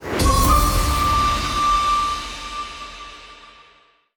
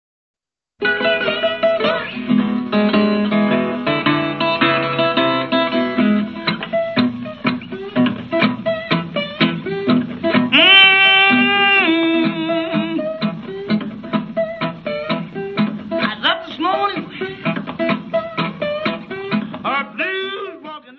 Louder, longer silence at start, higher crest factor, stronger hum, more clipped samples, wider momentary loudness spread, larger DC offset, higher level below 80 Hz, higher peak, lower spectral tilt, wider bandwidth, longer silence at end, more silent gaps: about the same, -19 LUFS vs -17 LUFS; second, 0 s vs 0.8 s; about the same, 16 dB vs 18 dB; neither; neither; first, 18 LU vs 12 LU; neither; first, -26 dBFS vs -58 dBFS; second, -4 dBFS vs 0 dBFS; second, -4 dB/octave vs -7 dB/octave; first, over 20 kHz vs 6 kHz; first, 0.65 s vs 0.05 s; neither